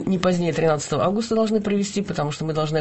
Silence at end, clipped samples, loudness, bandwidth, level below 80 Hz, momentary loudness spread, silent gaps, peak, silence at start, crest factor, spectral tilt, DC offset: 0 s; under 0.1%; -22 LUFS; 8.6 kHz; -52 dBFS; 4 LU; none; -2 dBFS; 0 s; 20 dB; -6 dB/octave; 0.3%